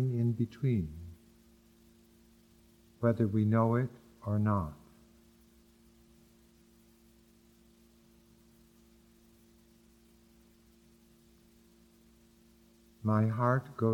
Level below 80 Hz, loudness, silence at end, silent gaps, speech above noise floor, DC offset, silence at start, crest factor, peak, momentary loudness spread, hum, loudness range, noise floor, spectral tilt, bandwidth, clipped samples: -62 dBFS; -32 LUFS; 0 s; none; 34 dB; under 0.1%; 0 s; 22 dB; -14 dBFS; 15 LU; none; 6 LU; -63 dBFS; -9.5 dB/octave; 9.4 kHz; under 0.1%